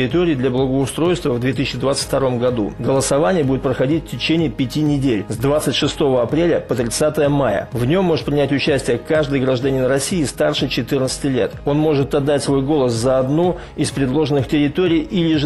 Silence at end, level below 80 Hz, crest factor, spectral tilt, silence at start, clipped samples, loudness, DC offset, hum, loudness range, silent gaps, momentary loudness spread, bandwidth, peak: 0 s; -38 dBFS; 10 dB; -5.5 dB/octave; 0 s; under 0.1%; -18 LUFS; 0.3%; none; 1 LU; none; 3 LU; 14 kHz; -6 dBFS